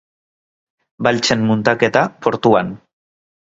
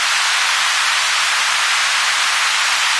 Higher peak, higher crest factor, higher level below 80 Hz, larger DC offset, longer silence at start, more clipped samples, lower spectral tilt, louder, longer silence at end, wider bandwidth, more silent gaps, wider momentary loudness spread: first, 0 dBFS vs -4 dBFS; first, 18 dB vs 12 dB; first, -52 dBFS vs -62 dBFS; neither; first, 1 s vs 0 s; neither; first, -5 dB/octave vs 4 dB/octave; about the same, -16 LUFS vs -14 LUFS; first, 0.75 s vs 0 s; second, 7.8 kHz vs 11 kHz; neither; first, 4 LU vs 0 LU